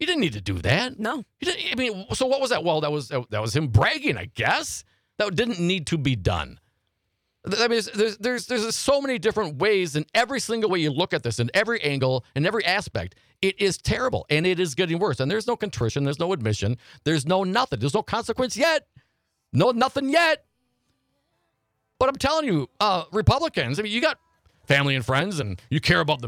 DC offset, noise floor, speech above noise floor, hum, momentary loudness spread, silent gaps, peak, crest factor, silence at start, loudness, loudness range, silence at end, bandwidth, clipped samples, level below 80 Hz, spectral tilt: under 0.1%; -76 dBFS; 52 dB; none; 7 LU; none; -4 dBFS; 20 dB; 0 s; -24 LUFS; 2 LU; 0 s; 16.5 kHz; under 0.1%; -48 dBFS; -5 dB/octave